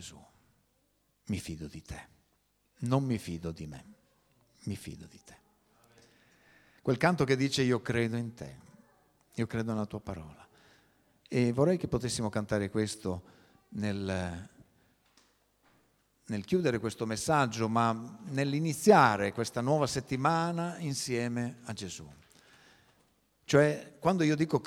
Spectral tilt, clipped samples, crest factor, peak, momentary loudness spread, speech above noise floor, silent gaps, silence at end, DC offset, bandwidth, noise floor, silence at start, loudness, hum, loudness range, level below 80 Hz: -5.5 dB/octave; under 0.1%; 24 dB; -8 dBFS; 18 LU; 43 dB; none; 0 s; under 0.1%; 16.5 kHz; -74 dBFS; 0 s; -31 LUFS; none; 11 LU; -60 dBFS